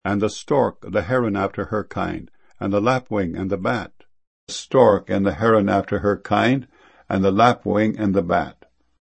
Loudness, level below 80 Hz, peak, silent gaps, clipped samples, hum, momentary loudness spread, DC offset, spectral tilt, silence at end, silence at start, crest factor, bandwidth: -20 LUFS; -50 dBFS; 0 dBFS; 4.27-4.47 s; under 0.1%; none; 11 LU; 0.1%; -6.5 dB/octave; 0.5 s; 0.05 s; 20 dB; 8.8 kHz